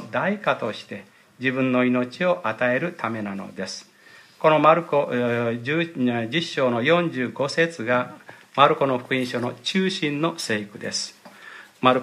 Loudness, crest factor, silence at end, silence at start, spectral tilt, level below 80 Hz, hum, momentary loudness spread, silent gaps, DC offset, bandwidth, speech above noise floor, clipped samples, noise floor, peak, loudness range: -23 LUFS; 22 dB; 0 s; 0 s; -5 dB/octave; -72 dBFS; none; 14 LU; none; under 0.1%; 14.5 kHz; 27 dB; under 0.1%; -50 dBFS; 0 dBFS; 3 LU